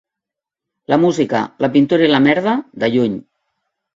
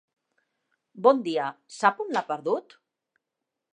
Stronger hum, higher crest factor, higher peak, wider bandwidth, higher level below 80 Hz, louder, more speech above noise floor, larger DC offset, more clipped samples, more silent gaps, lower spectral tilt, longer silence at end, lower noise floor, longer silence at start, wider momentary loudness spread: neither; second, 16 dB vs 24 dB; first, 0 dBFS vs -4 dBFS; second, 7.6 kHz vs 10.5 kHz; first, -58 dBFS vs -86 dBFS; first, -15 LUFS vs -26 LUFS; first, 70 dB vs 60 dB; neither; neither; neither; first, -6.5 dB/octave vs -4.5 dB/octave; second, 0.75 s vs 1.15 s; about the same, -84 dBFS vs -85 dBFS; about the same, 0.9 s vs 0.95 s; about the same, 7 LU vs 9 LU